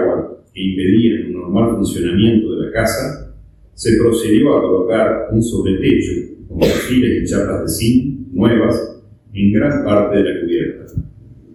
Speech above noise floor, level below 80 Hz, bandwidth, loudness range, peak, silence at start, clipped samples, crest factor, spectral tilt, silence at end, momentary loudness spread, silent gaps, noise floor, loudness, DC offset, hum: 25 dB; -36 dBFS; 14.5 kHz; 1 LU; 0 dBFS; 0 s; under 0.1%; 14 dB; -6.5 dB/octave; 0.2 s; 11 LU; none; -40 dBFS; -15 LUFS; under 0.1%; none